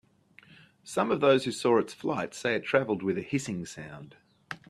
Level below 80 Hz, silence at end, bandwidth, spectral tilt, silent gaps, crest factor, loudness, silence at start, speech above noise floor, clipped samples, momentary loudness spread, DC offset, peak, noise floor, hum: -68 dBFS; 0.15 s; 13.5 kHz; -5 dB/octave; none; 22 dB; -28 LUFS; 0.85 s; 30 dB; under 0.1%; 18 LU; under 0.1%; -8 dBFS; -59 dBFS; none